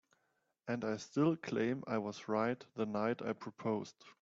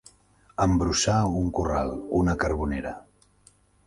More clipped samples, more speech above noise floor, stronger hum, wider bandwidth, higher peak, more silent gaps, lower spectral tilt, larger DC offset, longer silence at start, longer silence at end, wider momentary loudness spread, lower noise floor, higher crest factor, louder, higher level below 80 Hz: neither; first, 44 dB vs 35 dB; second, none vs 50 Hz at -50 dBFS; second, 7.8 kHz vs 11.5 kHz; second, -20 dBFS vs -10 dBFS; neither; about the same, -6 dB/octave vs -5 dB/octave; neither; about the same, 0.65 s vs 0.6 s; second, 0.1 s vs 0.85 s; second, 8 LU vs 12 LU; first, -81 dBFS vs -60 dBFS; about the same, 18 dB vs 16 dB; second, -38 LUFS vs -25 LUFS; second, -78 dBFS vs -38 dBFS